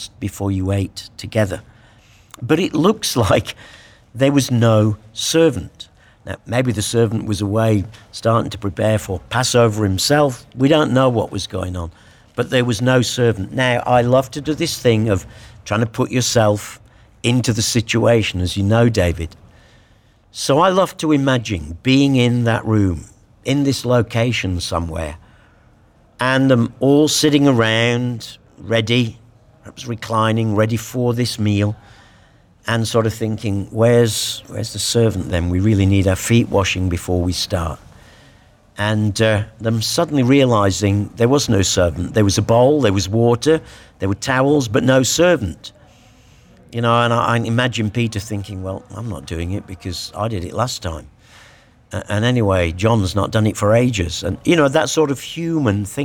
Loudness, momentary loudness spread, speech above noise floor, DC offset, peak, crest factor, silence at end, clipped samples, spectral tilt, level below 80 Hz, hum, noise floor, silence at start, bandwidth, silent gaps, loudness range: -17 LUFS; 13 LU; 35 dB; under 0.1%; -2 dBFS; 14 dB; 0 s; under 0.1%; -5.5 dB/octave; -42 dBFS; none; -52 dBFS; 0 s; 18 kHz; none; 4 LU